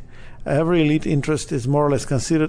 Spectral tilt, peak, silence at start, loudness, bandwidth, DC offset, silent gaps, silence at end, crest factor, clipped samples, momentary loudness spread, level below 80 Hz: -6.5 dB/octave; -8 dBFS; 0 s; -20 LUFS; 10 kHz; under 0.1%; none; 0 s; 12 dB; under 0.1%; 5 LU; -38 dBFS